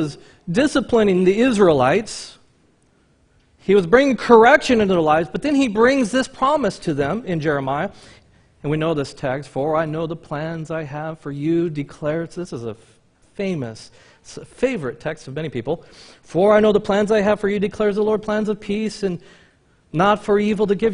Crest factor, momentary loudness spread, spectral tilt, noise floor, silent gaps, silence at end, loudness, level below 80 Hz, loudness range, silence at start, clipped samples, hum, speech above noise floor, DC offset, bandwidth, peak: 20 dB; 15 LU; -6 dB/octave; -58 dBFS; none; 0 s; -19 LUFS; -50 dBFS; 11 LU; 0 s; under 0.1%; none; 40 dB; under 0.1%; 10.5 kHz; 0 dBFS